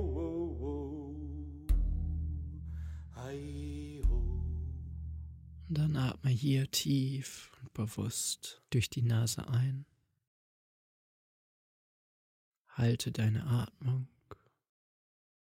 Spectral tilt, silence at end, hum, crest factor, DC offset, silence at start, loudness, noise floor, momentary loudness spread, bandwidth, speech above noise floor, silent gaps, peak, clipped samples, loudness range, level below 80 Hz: -5.5 dB/octave; 1.15 s; none; 18 dB; under 0.1%; 0 s; -36 LUFS; -58 dBFS; 13 LU; 16.5 kHz; 25 dB; 10.27-12.65 s; -18 dBFS; under 0.1%; 6 LU; -42 dBFS